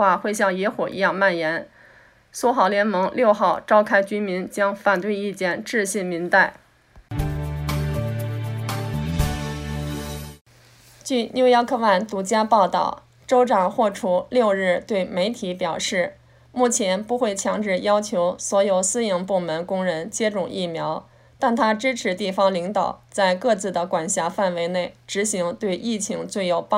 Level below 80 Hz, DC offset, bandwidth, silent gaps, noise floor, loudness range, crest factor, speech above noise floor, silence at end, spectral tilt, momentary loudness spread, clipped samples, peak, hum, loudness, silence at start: -44 dBFS; under 0.1%; 16 kHz; 10.41-10.45 s; -52 dBFS; 4 LU; 18 dB; 31 dB; 0 s; -4.5 dB/octave; 9 LU; under 0.1%; -4 dBFS; none; -22 LUFS; 0 s